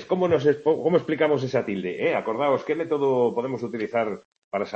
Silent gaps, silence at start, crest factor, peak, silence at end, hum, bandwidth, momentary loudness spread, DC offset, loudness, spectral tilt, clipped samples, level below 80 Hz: 4.25-4.32 s, 4.38-4.51 s; 0 s; 16 dB; -8 dBFS; 0 s; none; 7.8 kHz; 9 LU; under 0.1%; -24 LUFS; -7 dB/octave; under 0.1%; -68 dBFS